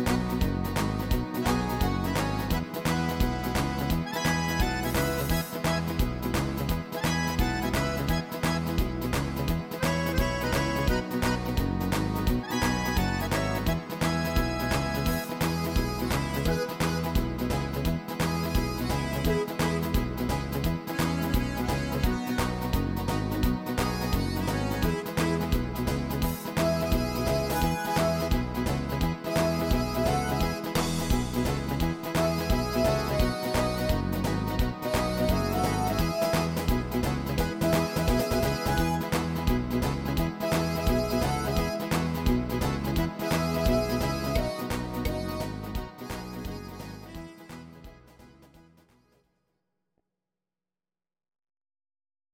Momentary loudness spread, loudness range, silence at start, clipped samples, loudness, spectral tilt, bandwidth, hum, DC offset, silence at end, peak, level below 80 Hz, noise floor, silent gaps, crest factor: 3 LU; 2 LU; 0 s; under 0.1%; -28 LUFS; -5.5 dB/octave; 17 kHz; none; under 0.1%; 3.9 s; -12 dBFS; -36 dBFS; under -90 dBFS; none; 16 dB